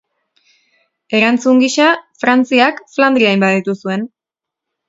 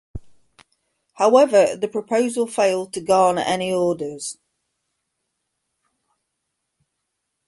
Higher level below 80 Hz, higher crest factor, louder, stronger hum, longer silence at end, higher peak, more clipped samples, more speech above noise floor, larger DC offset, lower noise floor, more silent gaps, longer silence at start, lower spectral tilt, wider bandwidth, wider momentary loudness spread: second, -64 dBFS vs -54 dBFS; second, 14 dB vs 20 dB; first, -13 LUFS vs -19 LUFS; neither; second, 0.8 s vs 3.15 s; about the same, 0 dBFS vs -2 dBFS; neither; first, 72 dB vs 59 dB; neither; first, -84 dBFS vs -77 dBFS; neither; first, 1.1 s vs 0.15 s; about the same, -4.5 dB/octave vs -4 dB/octave; second, 7.8 kHz vs 11.5 kHz; second, 9 LU vs 12 LU